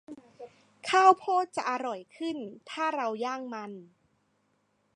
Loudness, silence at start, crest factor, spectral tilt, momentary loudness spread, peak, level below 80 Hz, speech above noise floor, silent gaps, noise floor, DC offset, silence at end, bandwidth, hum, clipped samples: -28 LUFS; 0.1 s; 22 dB; -3 dB/octave; 19 LU; -8 dBFS; -84 dBFS; 44 dB; none; -73 dBFS; under 0.1%; 1.1 s; 11 kHz; none; under 0.1%